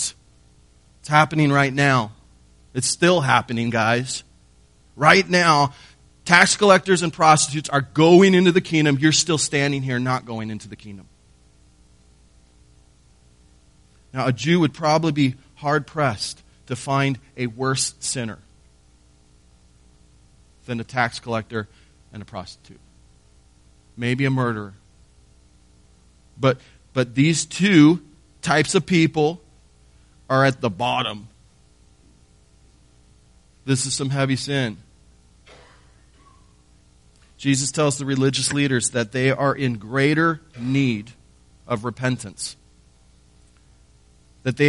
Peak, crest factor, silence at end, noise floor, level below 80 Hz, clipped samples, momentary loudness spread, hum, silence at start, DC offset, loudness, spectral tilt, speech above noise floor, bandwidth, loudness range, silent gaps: 0 dBFS; 22 dB; 0 s; -55 dBFS; -54 dBFS; under 0.1%; 17 LU; none; 0 s; under 0.1%; -20 LUFS; -4.5 dB/octave; 35 dB; 11.5 kHz; 13 LU; none